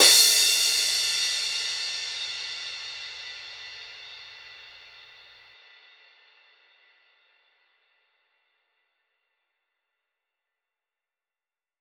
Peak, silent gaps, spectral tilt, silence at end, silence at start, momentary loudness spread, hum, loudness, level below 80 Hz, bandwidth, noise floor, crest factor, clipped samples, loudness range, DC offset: -4 dBFS; none; 3 dB/octave; 7 s; 0 s; 26 LU; none; -22 LUFS; -72 dBFS; over 20 kHz; under -90 dBFS; 26 dB; under 0.1%; 25 LU; under 0.1%